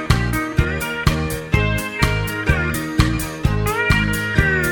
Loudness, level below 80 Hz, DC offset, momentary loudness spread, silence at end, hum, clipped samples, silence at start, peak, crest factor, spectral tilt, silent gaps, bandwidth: -19 LUFS; -26 dBFS; under 0.1%; 4 LU; 0 s; none; under 0.1%; 0 s; 0 dBFS; 18 dB; -5.5 dB/octave; none; 17.5 kHz